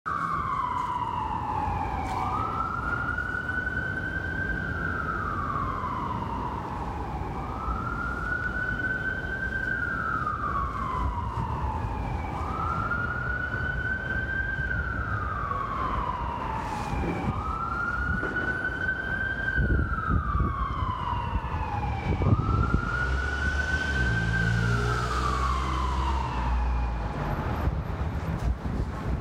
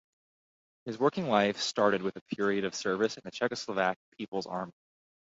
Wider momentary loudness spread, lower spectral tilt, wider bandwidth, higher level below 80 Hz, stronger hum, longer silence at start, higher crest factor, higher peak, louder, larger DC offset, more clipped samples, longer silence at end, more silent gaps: second, 5 LU vs 11 LU; first, -6.5 dB/octave vs -4.5 dB/octave; first, 10.5 kHz vs 8 kHz; first, -34 dBFS vs -72 dBFS; neither; second, 0.05 s vs 0.85 s; about the same, 18 dB vs 22 dB; about the same, -10 dBFS vs -10 dBFS; about the same, -29 LUFS vs -31 LUFS; neither; neither; second, 0 s vs 0.65 s; second, none vs 2.21-2.26 s, 3.96-4.12 s